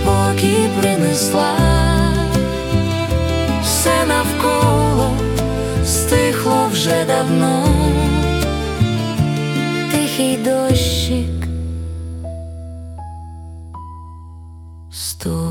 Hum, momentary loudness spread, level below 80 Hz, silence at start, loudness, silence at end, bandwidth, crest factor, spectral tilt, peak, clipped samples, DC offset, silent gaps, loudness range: none; 18 LU; -28 dBFS; 0 s; -16 LUFS; 0 s; 18 kHz; 14 dB; -5 dB/octave; -2 dBFS; under 0.1%; under 0.1%; none; 12 LU